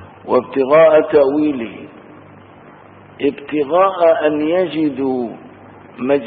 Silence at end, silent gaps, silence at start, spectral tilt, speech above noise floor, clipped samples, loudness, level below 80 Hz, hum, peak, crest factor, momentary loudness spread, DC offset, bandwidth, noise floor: 0 s; none; 0 s; -11 dB/octave; 27 dB; under 0.1%; -15 LUFS; -58 dBFS; none; -2 dBFS; 14 dB; 15 LU; under 0.1%; 4.7 kHz; -41 dBFS